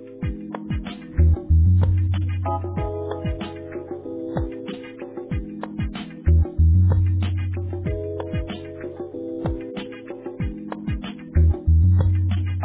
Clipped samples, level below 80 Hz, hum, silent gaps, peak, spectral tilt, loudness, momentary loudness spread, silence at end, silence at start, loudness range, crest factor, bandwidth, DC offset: under 0.1%; -26 dBFS; none; none; -8 dBFS; -12 dB/octave; -23 LUFS; 15 LU; 0 s; 0 s; 8 LU; 14 dB; 4 kHz; under 0.1%